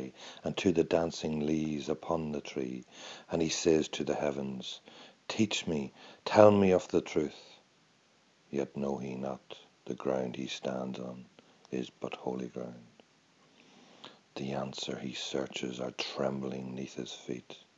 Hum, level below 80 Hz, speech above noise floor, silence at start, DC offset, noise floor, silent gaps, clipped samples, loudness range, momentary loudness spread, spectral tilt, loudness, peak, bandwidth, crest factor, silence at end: none; -64 dBFS; 34 dB; 0 s; under 0.1%; -67 dBFS; none; under 0.1%; 12 LU; 17 LU; -5 dB/octave; -33 LUFS; -6 dBFS; 8 kHz; 28 dB; 0.2 s